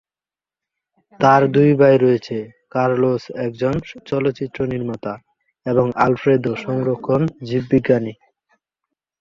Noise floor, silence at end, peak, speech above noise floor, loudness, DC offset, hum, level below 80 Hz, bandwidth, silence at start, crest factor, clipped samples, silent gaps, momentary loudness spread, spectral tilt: under -90 dBFS; 1.1 s; -2 dBFS; over 73 dB; -18 LUFS; under 0.1%; none; -52 dBFS; 7.2 kHz; 1.2 s; 18 dB; under 0.1%; none; 14 LU; -8.5 dB/octave